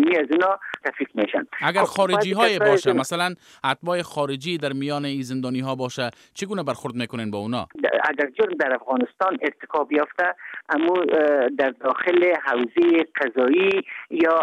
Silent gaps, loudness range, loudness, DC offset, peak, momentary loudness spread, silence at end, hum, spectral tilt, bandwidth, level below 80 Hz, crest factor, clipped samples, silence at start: none; 6 LU; -22 LUFS; under 0.1%; -2 dBFS; 9 LU; 0 s; none; -5 dB/octave; 14 kHz; -68 dBFS; 18 dB; under 0.1%; 0 s